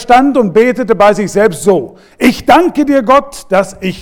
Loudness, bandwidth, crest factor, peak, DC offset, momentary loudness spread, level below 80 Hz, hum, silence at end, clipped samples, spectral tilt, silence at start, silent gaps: -10 LUFS; 18.5 kHz; 10 dB; 0 dBFS; under 0.1%; 6 LU; -38 dBFS; none; 0 s; 2%; -5.5 dB/octave; 0 s; none